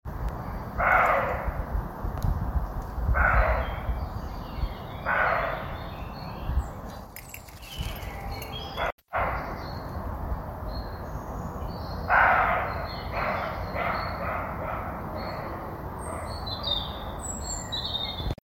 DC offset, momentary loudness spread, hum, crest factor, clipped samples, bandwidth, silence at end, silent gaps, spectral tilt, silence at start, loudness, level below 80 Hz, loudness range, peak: under 0.1%; 14 LU; none; 22 dB; under 0.1%; 17 kHz; 0.1 s; 8.92-8.98 s; -4.5 dB/octave; 0.05 s; -29 LUFS; -36 dBFS; 7 LU; -6 dBFS